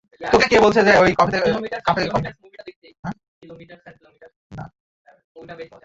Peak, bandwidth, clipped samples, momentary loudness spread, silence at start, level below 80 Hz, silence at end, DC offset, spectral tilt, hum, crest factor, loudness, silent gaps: -2 dBFS; 7.8 kHz; under 0.1%; 24 LU; 0.2 s; -48 dBFS; 0.2 s; under 0.1%; -5 dB/octave; none; 18 dB; -17 LUFS; 2.76-2.82 s, 2.99-3.03 s, 3.28-3.41 s, 4.36-4.50 s, 4.80-5.05 s, 5.24-5.35 s